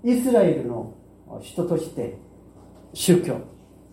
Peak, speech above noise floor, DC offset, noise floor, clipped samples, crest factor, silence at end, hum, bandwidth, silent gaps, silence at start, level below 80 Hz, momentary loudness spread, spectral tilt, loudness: -4 dBFS; 26 dB; under 0.1%; -48 dBFS; under 0.1%; 20 dB; 0.4 s; none; 16.5 kHz; none; 0.05 s; -56 dBFS; 21 LU; -6 dB/octave; -23 LUFS